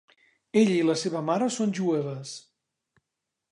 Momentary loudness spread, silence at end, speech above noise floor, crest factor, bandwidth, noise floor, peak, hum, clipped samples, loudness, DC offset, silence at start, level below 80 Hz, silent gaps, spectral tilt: 15 LU; 1.1 s; 60 dB; 18 dB; 11 kHz; -85 dBFS; -10 dBFS; none; under 0.1%; -26 LUFS; under 0.1%; 0.55 s; -78 dBFS; none; -5.5 dB/octave